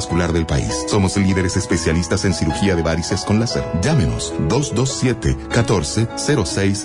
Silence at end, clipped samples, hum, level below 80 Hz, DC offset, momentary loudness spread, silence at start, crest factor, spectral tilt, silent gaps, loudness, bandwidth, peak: 0 s; under 0.1%; none; -34 dBFS; under 0.1%; 3 LU; 0 s; 12 dB; -5 dB/octave; none; -18 LUFS; 11 kHz; -6 dBFS